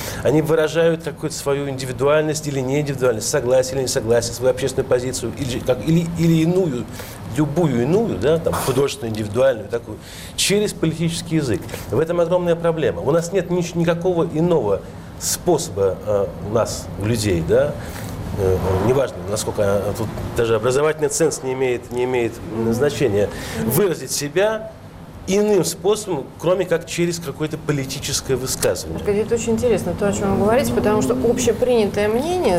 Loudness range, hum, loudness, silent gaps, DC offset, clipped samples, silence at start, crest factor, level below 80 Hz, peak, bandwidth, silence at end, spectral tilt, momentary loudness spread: 2 LU; none; -20 LUFS; none; under 0.1%; under 0.1%; 0 s; 12 dB; -40 dBFS; -6 dBFS; 16 kHz; 0 s; -5 dB/octave; 7 LU